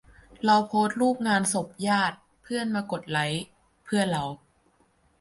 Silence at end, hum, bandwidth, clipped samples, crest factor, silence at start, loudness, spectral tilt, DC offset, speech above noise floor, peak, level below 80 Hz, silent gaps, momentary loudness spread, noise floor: 0.85 s; none; 11.5 kHz; under 0.1%; 18 dB; 0.4 s; -26 LUFS; -4.5 dB/octave; under 0.1%; 40 dB; -10 dBFS; -62 dBFS; none; 11 LU; -65 dBFS